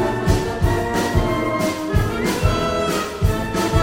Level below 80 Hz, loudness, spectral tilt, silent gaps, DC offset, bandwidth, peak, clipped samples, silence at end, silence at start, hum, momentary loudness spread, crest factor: -28 dBFS; -20 LUFS; -5.5 dB/octave; none; under 0.1%; 17 kHz; -4 dBFS; under 0.1%; 0 s; 0 s; none; 2 LU; 16 dB